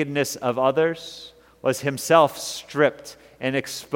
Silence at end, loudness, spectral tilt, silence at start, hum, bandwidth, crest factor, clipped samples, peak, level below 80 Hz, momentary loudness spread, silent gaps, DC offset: 0 s; -22 LUFS; -4 dB/octave; 0 s; none; 17 kHz; 20 dB; under 0.1%; -2 dBFS; -64 dBFS; 18 LU; none; under 0.1%